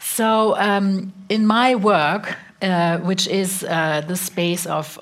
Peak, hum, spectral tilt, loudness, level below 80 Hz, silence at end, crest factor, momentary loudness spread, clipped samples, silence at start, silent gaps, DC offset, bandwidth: -4 dBFS; none; -4.5 dB/octave; -19 LUFS; -68 dBFS; 0 s; 16 dB; 9 LU; under 0.1%; 0 s; none; under 0.1%; 16 kHz